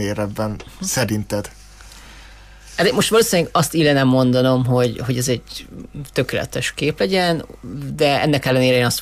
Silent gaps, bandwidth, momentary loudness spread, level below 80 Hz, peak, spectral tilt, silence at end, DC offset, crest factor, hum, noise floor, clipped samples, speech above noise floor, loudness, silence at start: none; 15.5 kHz; 14 LU; -44 dBFS; -4 dBFS; -4.5 dB/octave; 0 s; under 0.1%; 14 dB; none; -41 dBFS; under 0.1%; 23 dB; -18 LUFS; 0 s